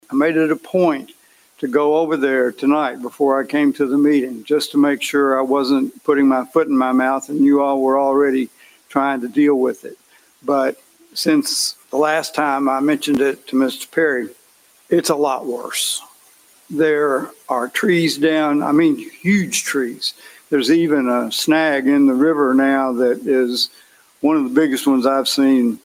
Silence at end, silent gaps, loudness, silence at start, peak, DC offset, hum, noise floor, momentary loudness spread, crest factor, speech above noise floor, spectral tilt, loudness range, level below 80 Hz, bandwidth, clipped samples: 0.05 s; none; -17 LUFS; 0.1 s; -2 dBFS; under 0.1%; none; -53 dBFS; 7 LU; 16 dB; 36 dB; -4 dB/octave; 3 LU; -64 dBFS; 16.5 kHz; under 0.1%